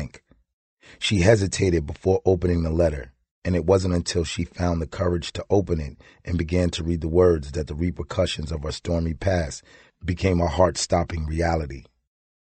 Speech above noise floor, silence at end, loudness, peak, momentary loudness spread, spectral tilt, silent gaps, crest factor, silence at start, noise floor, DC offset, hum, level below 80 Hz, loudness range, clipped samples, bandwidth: 23 dB; 0.65 s; -23 LUFS; -2 dBFS; 11 LU; -6 dB/octave; 0.53-0.77 s, 3.31-3.42 s; 20 dB; 0 s; -46 dBFS; under 0.1%; none; -36 dBFS; 3 LU; under 0.1%; 8.8 kHz